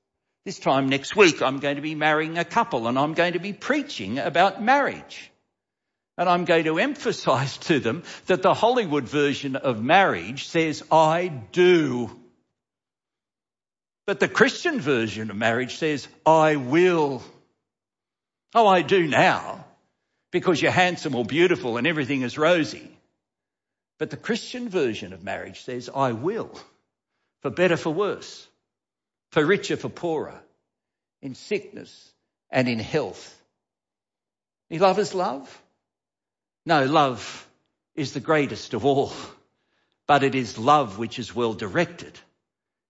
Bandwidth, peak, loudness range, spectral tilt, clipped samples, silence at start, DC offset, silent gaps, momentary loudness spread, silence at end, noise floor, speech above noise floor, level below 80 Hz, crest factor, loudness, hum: 8 kHz; -4 dBFS; 7 LU; -5 dB/octave; under 0.1%; 0.45 s; under 0.1%; none; 16 LU; 0.7 s; under -90 dBFS; over 67 dB; -66 dBFS; 20 dB; -23 LUFS; none